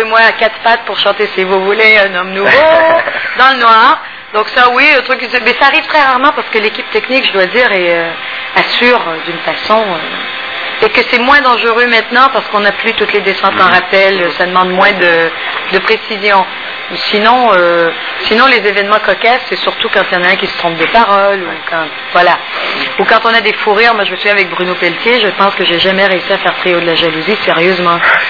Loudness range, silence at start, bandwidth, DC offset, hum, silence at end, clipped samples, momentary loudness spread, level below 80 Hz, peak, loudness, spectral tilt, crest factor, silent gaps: 3 LU; 0 s; 5.4 kHz; 0.5%; none; 0 s; 1%; 8 LU; -46 dBFS; 0 dBFS; -9 LUFS; -5 dB/octave; 10 dB; none